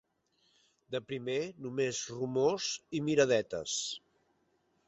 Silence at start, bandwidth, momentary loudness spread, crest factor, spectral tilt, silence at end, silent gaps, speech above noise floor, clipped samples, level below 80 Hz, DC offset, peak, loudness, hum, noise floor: 0.9 s; 8.2 kHz; 11 LU; 20 dB; -3.5 dB/octave; 0.9 s; none; 42 dB; under 0.1%; -72 dBFS; under 0.1%; -14 dBFS; -33 LUFS; none; -75 dBFS